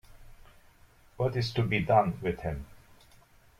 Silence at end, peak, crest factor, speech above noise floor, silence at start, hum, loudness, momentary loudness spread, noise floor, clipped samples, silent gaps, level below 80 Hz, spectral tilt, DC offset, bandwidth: 0.85 s; -10 dBFS; 22 dB; 30 dB; 0.1 s; none; -29 LUFS; 14 LU; -59 dBFS; under 0.1%; none; -52 dBFS; -7 dB/octave; under 0.1%; 15 kHz